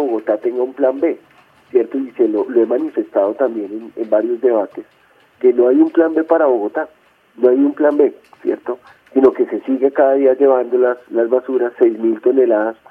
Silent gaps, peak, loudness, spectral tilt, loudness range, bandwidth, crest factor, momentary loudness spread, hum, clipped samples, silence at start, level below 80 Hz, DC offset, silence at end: none; 0 dBFS; -16 LUFS; -8.5 dB/octave; 3 LU; 3.5 kHz; 16 dB; 10 LU; none; under 0.1%; 0 s; -66 dBFS; under 0.1%; 0.15 s